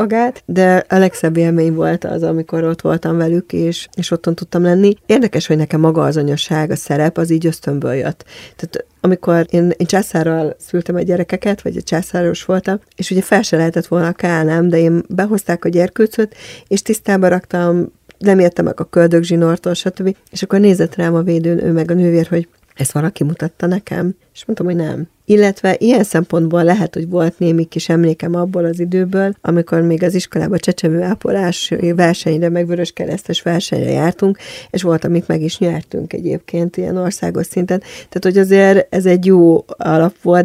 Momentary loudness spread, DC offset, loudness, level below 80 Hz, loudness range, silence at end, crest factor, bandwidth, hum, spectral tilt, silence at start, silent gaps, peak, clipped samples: 8 LU; under 0.1%; -15 LUFS; -50 dBFS; 3 LU; 0 s; 14 dB; 15 kHz; none; -6.5 dB/octave; 0 s; none; 0 dBFS; under 0.1%